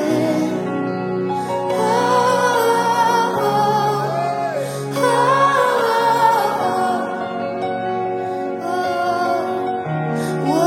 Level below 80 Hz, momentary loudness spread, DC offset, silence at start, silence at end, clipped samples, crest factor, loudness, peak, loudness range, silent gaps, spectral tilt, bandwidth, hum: -64 dBFS; 8 LU; under 0.1%; 0 s; 0 s; under 0.1%; 14 dB; -18 LUFS; -2 dBFS; 4 LU; none; -5 dB/octave; 16.5 kHz; none